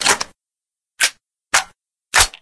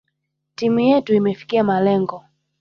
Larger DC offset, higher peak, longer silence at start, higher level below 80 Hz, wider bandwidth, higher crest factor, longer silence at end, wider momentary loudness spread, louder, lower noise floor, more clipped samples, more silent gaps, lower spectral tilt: neither; first, 0 dBFS vs -4 dBFS; second, 0 s vs 0.6 s; first, -40 dBFS vs -60 dBFS; first, 11 kHz vs 6.8 kHz; first, 20 dB vs 14 dB; second, 0.15 s vs 0.4 s; first, 11 LU vs 7 LU; about the same, -18 LUFS vs -18 LUFS; first, -89 dBFS vs -74 dBFS; neither; neither; second, 0.5 dB/octave vs -7.5 dB/octave